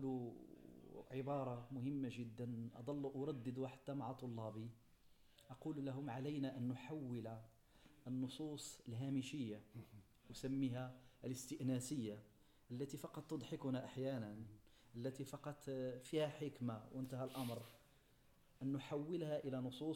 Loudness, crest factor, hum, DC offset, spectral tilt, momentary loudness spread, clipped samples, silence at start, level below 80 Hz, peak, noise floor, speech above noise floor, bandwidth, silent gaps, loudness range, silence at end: -48 LUFS; 16 dB; none; under 0.1%; -6.5 dB/octave; 13 LU; under 0.1%; 0 s; -76 dBFS; -32 dBFS; -72 dBFS; 25 dB; 17 kHz; none; 2 LU; 0 s